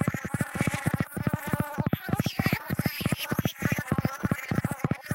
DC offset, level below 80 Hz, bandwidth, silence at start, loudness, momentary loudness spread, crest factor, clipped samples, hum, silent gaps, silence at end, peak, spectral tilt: under 0.1%; -48 dBFS; 17 kHz; 0 s; -29 LUFS; 3 LU; 18 dB; under 0.1%; none; none; 0 s; -10 dBFS; -5.5 dB/octave